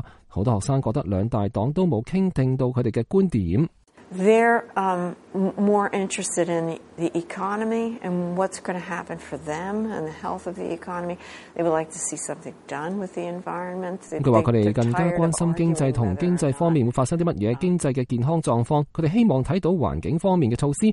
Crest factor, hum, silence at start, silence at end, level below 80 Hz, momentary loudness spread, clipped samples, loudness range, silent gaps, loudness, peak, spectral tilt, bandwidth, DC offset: 18 dB; none; 0 s; 0 s; -48 dBFS; 10 LU; under 0.1%; 7 LU; none; -24 LUFS; -4 dBFS; -6.5 dB/octave; 11.5 kHz; under 0.1%